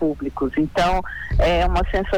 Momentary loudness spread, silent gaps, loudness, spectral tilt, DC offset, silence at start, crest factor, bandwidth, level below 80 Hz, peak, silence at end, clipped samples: 7 LU; none; -21 LUFS; -6.5 dB/octave; under 0.1%; 0 s; 14 dB; 18.5 kHz; -26 dBFS; -6 dBFS; 0 s; under 0.1%